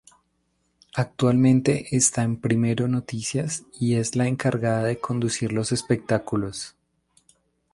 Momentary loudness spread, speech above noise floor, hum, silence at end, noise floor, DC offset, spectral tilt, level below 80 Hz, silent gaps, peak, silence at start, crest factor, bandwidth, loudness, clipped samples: 9 LU; 48 dB; none; 1.05 s; -71 dBFS; under 0.1%; -5.5 dB/octave; -56 dBFS; none; -6 dBFS; 0.95 s; 18 dB; 11.5 kHz; -23 LUFS; under 0.1%